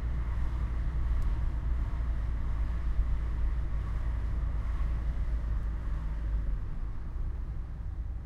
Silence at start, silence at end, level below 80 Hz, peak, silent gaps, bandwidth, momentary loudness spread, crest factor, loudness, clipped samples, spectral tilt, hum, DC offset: 0 s; 0 s; -32 dBFS; -16 dBFS; none; 4.2 kHz; 6 LU; 14 dB; -35 LUFS; under 0.1%; -8.5 dB/octave; none; under 0.1%